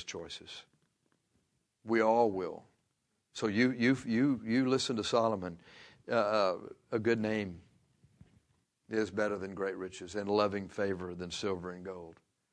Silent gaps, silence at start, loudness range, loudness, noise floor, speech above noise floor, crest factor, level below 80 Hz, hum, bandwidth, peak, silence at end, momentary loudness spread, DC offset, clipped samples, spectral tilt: none; 0 s; 5 LU; -33 LUFS; -80 dBFS; 48 dB; 20 dB; -70 dBFS; none; 10.5 kHz; -14 dBFS; 0.4 s; 18 LU; under 0.1%; under 0.1%; -5.5 dB/octave